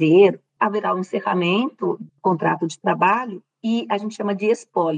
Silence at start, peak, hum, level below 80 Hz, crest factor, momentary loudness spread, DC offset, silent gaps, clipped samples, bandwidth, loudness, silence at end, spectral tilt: 0 s; -4 dBFS; none; -78 dBFS; 16 dB; 8 LU; under 0.1%; none; under 0.1%; 9.4 kHz; -21 LUFS; 0 s; -6.5 dB/octave